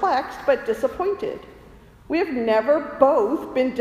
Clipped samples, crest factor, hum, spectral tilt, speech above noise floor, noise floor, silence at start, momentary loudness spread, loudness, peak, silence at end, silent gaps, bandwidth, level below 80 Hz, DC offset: under 0.1%; 20 dB; none; -5.5 dB/octave; 26 dB; -47 dBFS; 0 s; 9 LU; -22 LUFS; -2 dBFS; 0 s; none; 15 kHz; -52 dBFS; under 0.1%